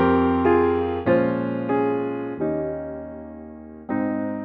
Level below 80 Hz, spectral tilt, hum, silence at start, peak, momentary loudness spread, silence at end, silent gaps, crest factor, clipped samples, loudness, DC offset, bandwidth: -48 dBFS; -10.5 dB/octave; none; 0 s; -6 dBFS; 19 LU; 0 s; none; 16 dB; under 0.1%; -23 LUFS; under 0.1%; 4.7 kHz